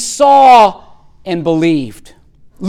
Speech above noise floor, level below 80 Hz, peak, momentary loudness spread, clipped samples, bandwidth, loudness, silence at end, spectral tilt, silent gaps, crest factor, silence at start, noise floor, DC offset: 22 dB; -46 dBFS; 0 dBFS; 19 LU; under 0.1%; 14.5 kHz; -9 LUFS; 0 s; -4.5 dB/octave; none; 10 dB; 0 s; -30 dBFS; under 0.1%